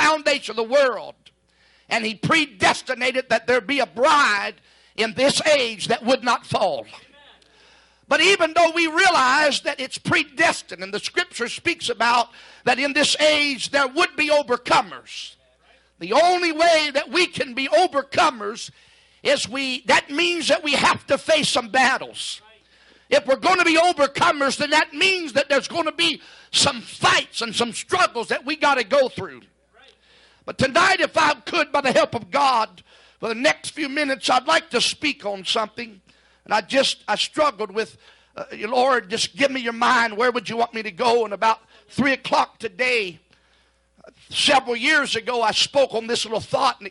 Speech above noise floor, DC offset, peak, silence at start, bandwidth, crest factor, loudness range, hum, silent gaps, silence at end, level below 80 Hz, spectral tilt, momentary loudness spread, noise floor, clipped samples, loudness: 41 dB; under 0.1%; -6 dBFS; 0 s; 11.5 kHz; 16 dB; 3 LU; none; none; 0 s; -62 dBFS; -2.5 dB/octave; 11 LU; -61 dBFS; under 0.1%; -20 LUFS